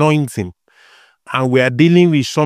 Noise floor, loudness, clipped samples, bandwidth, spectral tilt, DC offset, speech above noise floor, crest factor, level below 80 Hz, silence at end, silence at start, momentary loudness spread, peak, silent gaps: -48 dBFS; -14 LUFS; under 0.1%; 14 kHz; -6.5 dB/octave; under 0.1%; 36 dB; 14 dB; -56 dBFS; 0 s; 0 s; 13 LU; 0 dBFS; none